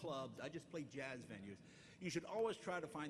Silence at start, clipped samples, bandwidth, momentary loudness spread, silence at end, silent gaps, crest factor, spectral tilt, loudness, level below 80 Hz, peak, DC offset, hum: 0 s; under 0.1%; 13 kHz; 13 LU; 0 s; none; 18 dB; -5 dB/octave; -48 LUFS; -80 dBFS; -30 dBFS; under 0.1%; none